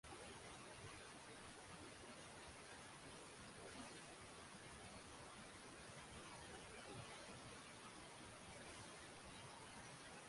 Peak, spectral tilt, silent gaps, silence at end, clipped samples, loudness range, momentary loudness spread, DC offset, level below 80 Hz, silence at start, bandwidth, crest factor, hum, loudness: -44 dBFS; -3 dB/octave; none; 0 s; under 0.1%; 1 LU; 2 LU; under 0.1%; -74 dBFS; 0.05 s; 11.5 kHz; 14 dB; none; -57 LUFS